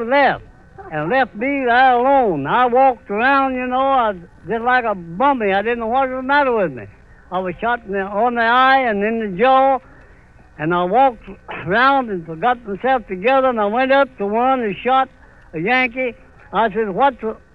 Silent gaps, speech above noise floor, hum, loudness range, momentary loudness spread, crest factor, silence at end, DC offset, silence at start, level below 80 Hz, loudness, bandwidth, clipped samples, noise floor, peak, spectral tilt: none; 30 dB; none; 3 LU; 11 LU; 14 dB; 0.2 s; 0.2%; 0 s; -48 dBFS; -17 LUFS; 5.6 kHz; under 0.1%; -46 dBFS; -2 dBFS; -7.5 dB/octave